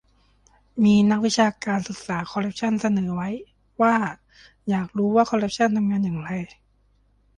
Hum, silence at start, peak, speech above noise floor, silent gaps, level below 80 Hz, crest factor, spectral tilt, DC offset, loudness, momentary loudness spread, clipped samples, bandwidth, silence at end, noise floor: none; 0.75 s; -6 dBFS; 40 dB; none; -58 dBFS; 18 dB; -6 dB/octave; under 0.1%; -23 LUFS; 13 LU; under 0.1%; 9.8 kHz; 0.9 s; -62 dBFS